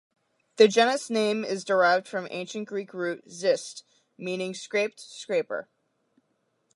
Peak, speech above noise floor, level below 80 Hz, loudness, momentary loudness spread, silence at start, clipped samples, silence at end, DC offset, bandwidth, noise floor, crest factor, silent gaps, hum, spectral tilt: -4 dBFS; 48 dB; -84 dBFS; -26 LUFS; 15 LU; 0.6 s; under 0.1%; 1.15 s; under 0.1%; 11.5 kHz; -74 dBFS; 22 dB; none; none; -3.5 dB/octave